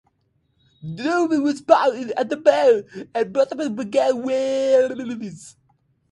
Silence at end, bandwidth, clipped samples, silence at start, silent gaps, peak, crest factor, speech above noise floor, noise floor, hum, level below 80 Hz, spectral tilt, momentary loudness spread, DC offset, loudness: 0.6 s; 11.5 kHz; under 0.1%; 0.85 s; none; 0 dBFS; 20 dB; 47 dB; -67 dBFS; none; -66 dBFS; -5 dB/octave; 14 LU; under 0.1%; -20 LUFS